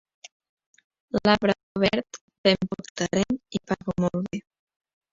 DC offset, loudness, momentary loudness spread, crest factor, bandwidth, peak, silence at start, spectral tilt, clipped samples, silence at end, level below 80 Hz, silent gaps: under 0.1%; -25 LUFS; 10 LU; 22 dB; 7.8 kHz; -4 dBFS; 1.15 s; -5 dB/octave; under 0.1%; 0.7 s; -54 dBFS; 1.63-1.75 s, 2.21-2.28 s, 2.38-2.44 s, 2.90-2.95 s